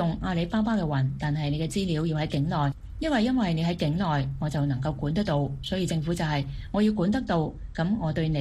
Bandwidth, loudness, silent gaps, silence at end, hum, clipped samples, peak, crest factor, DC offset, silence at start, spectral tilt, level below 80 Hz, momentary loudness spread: 12.5 kHz; -27 LUFS; none; 0 s; none; under 0.1%; -12 dBFS; 14 dB; under 0.1%; 0 s; -7 dB/octave; -42 dBFS; 5 LU